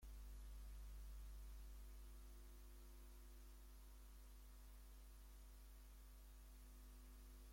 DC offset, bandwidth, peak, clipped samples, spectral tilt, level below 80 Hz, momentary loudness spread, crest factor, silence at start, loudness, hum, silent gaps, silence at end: under 0.1%; 16.5 kHz; -50 dBFS; under 0.1%; -4.5 dB/octave; -60 dBFS; 5 LU; 10 dB; 0 s; -63 LUFS; none; none; 0 s